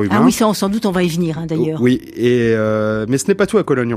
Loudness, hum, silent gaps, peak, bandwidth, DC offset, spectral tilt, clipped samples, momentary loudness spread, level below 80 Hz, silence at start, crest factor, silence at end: -16 LUFS; none; none; 0 dBFS; 15 kHz; under 0.1%; -6 dB/octave; under 0.1%; 5 LU; -46 dBFS; 0 s; 14 dB; 0 s